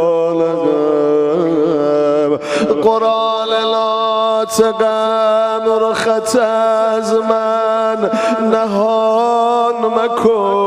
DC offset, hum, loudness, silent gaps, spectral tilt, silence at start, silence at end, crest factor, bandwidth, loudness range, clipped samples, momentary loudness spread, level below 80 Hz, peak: under 0.1%; none; -14 LUFS; none; -4.5 dB/octave; 0 s; 0 s; 12 dB; 14 kHz; 0 LU; under 0.1%; 2 LU; -56 dBFS; 0 dBFS